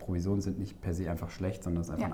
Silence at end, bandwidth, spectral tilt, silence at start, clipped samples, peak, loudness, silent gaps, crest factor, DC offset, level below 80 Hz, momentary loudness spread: 0 s; 16 kHz; -7.5 dB/octave; 0 s; under 0.1%; -18 dBFS; -35 LUFS; none; 14 dB; under 0.1%; -48 dBFS; 5 LU